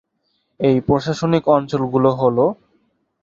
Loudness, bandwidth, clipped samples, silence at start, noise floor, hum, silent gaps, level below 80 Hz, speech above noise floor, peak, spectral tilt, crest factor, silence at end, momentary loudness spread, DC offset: -17 LUFS; 7.8 kHz; under 0.1%; 0.6 s; -68 dBFS; none; none; -50 dBFS; 52 dB; -2 dBFS; -7.5 dB/octave; 18 dB; 0.7 s; 5 LU; under 0.1%